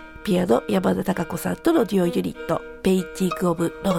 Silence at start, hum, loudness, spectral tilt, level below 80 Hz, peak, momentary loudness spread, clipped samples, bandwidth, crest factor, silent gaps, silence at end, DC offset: 0 s; none; -23 LUFS; -6.5 dB/octave; -48 dBFS; -4 dBFS; 7 LU; under 0.1%; 17 kHz; 18 dB; none; 0 s; under 0.1%